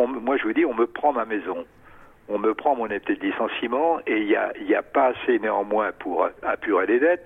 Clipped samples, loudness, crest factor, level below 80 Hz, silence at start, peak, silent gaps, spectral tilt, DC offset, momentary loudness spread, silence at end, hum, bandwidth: under 0.1%; -23 LUFS; 16 dB; -60 dBFS; 0 s; -8 dBFS; none; -7 dB/octave; under 0.1%; 6 LU; 0 s; none; 3.8 kHz